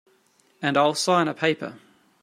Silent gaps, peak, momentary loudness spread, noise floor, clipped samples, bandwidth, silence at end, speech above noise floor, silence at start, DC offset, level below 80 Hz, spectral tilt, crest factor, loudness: none; -6 dBFS; 10 LU; -62 dBFS; under 0.1%; 16 kHz; 0.45 s; 40 dB; 0.6 s; under 0.1%; -72 dBFS; -4 dB/octave; 20 dB; -23 LUFS